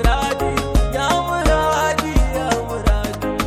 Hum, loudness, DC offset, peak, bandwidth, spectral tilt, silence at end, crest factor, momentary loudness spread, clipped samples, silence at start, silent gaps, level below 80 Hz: none; -19 LUFS; under 0.1%; -4 dBFS; 15.5 kHz; -5 dB/octave; 0 s; 14 dB; 4 LU; under 0.1%; 0 s; none; -22 dBFS